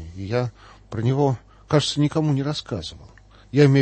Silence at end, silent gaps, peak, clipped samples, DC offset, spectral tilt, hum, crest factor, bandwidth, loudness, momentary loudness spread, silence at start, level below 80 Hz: 0 s; none; -4 dBFS; under 0.1%; under 0.1%; -6.5 dB/octave; none; 18 dB; 8.8 kHz; -23 LUFS; 13 LU; 0 s; -50 dBFS